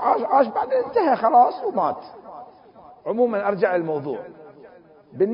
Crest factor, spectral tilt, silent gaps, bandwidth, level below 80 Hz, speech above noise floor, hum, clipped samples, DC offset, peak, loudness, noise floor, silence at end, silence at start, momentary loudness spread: 18 dB; -11 dB/octave; none; 5.4 kHz; -66 dBFS; 28 dB; none; under 0.1%; under 0.1%; -4 dBFS; -21 LUFS; -48 dBFS; 0 s; 0 s; 23 LU